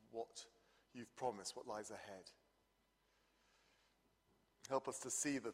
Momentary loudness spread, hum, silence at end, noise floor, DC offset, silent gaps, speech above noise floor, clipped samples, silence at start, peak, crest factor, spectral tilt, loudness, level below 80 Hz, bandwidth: 20 LU; none; 0 s; -81 dBFS; under 0.1%; none; 34 dB; under 0.1%; 0.05 s; -26 dBFS; 24 dB; -2.5 dB/octave; -46 LUFS; -86 dBFS; 15.5 kHz